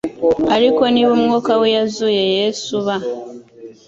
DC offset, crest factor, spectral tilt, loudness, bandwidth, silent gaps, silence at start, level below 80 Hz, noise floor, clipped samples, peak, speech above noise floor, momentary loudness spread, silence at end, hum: under 0.1%; 14 dB; -4.5 dB/octave; -16 LUFS; 7.8 kHz; none; 0.05 s; -52 dBFS; -38 dBFS; under 0.1%; -2 dBFS; 23 dB; 9 LU; 0.15 s; none